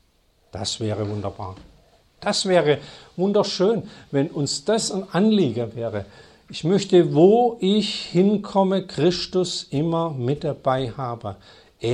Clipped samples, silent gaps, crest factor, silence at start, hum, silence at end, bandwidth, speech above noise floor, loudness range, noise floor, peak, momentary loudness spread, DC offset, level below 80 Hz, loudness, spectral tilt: under 0.1%; none; 18 dB; 0.55 s; none; 0 s; 11.5 kHz; 40 dB; 4 LU; -61 dBFS; -4 dBFS; 12 LU; under 0.1%; -56 dBFS; -22 LUFS; -5.5 dB/octave